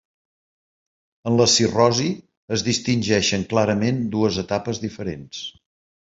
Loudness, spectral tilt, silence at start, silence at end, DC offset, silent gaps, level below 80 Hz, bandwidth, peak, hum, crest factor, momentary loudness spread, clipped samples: -20 LUFS; -4 dB/octave; 1.25 s; 0.55 s; under 0.1%; 2.37-2.48 s; -50 dBFS; 8 kHz; -2 dBFS; none; 20 dB; 16 LU; under 0.1%